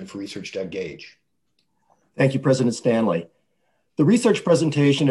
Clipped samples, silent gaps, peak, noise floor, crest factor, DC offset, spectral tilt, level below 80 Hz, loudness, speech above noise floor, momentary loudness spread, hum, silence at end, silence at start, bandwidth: under 0.1%; none; -4 dBFS; -72 dBFS; 18 dB; under 0.1%; -6 dB/octave; -62 dBFS; -21 LUFS; 52 dB; 15 LU; none; 0 s; 0 s; 12 kHz